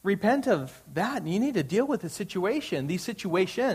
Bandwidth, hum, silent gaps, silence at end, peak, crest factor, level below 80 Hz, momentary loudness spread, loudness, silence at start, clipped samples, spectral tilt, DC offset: 15.5 kHz; none; none; 0 s; -10 dBFS; 16 dB; -64 dBFS; 7 LU; -28 LUFS; 0.05 s; under 0.1%; -5.5 dB/octave; under 0.1%